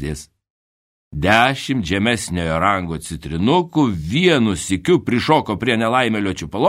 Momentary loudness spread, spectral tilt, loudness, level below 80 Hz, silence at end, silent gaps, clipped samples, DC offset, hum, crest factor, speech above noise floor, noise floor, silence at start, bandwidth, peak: 10 LU; -5 dB/octave; -18 LUFS; -40 dBFS; 0 s; 0.50-1.11 s; under 0.1%; under 0.1%; none; 18 dB; over 72 dB; under -90 dBFS; 0 s; 16 kHz; 0 dBFS